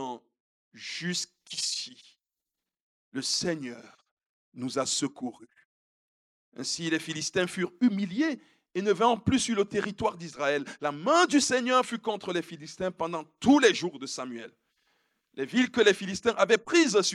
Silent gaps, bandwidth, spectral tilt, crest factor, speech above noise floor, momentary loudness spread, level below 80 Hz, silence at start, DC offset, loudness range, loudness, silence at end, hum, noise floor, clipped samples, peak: 0.40-0.71 s, 2.80-3.12 s, 4.11-4.17 s, 4.26-4.52 s, 5.65-6.52 s; 13 kHz; -3.5 dB/octave; 22 dB; 61 dB; 16 LU; -66 dBFS; 0 s; under 0.1%; 8 LU; -27 LUFS; 0 s; none; -89 dBFS; under 0.1%; -8 dBFS